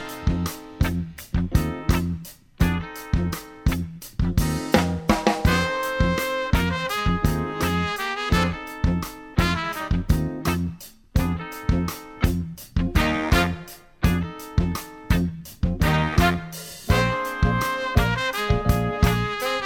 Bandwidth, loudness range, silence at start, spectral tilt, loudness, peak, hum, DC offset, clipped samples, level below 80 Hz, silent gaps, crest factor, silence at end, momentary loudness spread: 17.5 kHz; 3 LU; 0 s; -5.5 dB/octave; -24 LUFS; -2 dBFS; none; under 0.1%; under 0.1%; -30 dBFS; none; 22 dB; 0 s; 8 LU